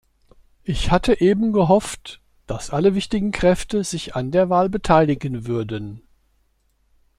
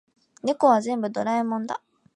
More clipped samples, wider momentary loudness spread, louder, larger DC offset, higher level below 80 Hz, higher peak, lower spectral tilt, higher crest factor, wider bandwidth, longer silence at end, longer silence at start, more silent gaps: neither; first, 15 LU vs 12 LU; first, -20 LUFS vs -24 LUFS; neither; first, -36 dBFS vs -78 dBFS; first, -2 dBFS vs -6 dBFS; about the same, -6 dB/octave vs -5.5 dB/octave; about the same, 18 dB vs 18 dB; first, 13 kHz vs 10.5 kHz; first, 1.2 s vs 0.4 s; first, 0.65 s vs 0.45 s; neither